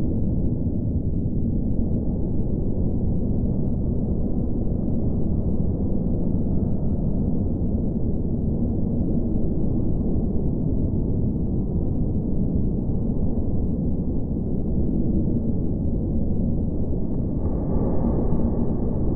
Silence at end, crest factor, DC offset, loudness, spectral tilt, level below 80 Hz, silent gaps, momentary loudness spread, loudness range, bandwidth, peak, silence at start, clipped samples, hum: 0 s; 14 dB; under 0.1%; -25 LUFS; -15.5 dB/octave; -28 dBFS; none; 2 LU; 1 LU; 1.4 kHz; -8 dBFS; 0 s; under 0.1%; none